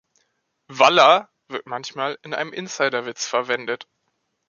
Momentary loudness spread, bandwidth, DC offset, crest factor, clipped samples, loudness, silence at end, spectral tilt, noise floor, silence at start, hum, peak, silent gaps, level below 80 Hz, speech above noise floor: 17 LU; 7.4 kHz; under 0.1%; 20 dB; under 0.1%; -20 LUFS; 0.65 s; -2.5 dB/octave; -73 dBFS; 0.7 s; none; -2 dBFS; none; -74 dBFS; 53 dB